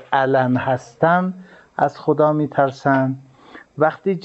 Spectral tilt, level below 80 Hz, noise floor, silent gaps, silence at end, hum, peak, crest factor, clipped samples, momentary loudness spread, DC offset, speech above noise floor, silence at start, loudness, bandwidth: -8 dB/octave; -64 dBFS; -44 dBFS; none; 0.05 s; none; -2 dBFS; 18 dB; under 0.1%; 12 LU; under 0.1%; 26 dB; 0 s; -19 LUFS; 8.2 kHz